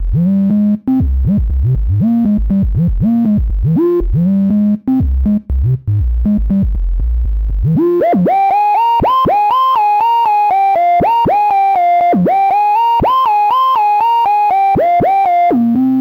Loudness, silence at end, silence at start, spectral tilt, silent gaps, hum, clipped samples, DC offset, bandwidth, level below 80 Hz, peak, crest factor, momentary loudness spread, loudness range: -12 LUFS; 0 s; 0 s; -9.5 dB/octave; none; none; under 0.1%; under 0.1%; 16.5 kHz; -20 dBFS; -6 dBFS; 4 dB; 4 LU; 3 LU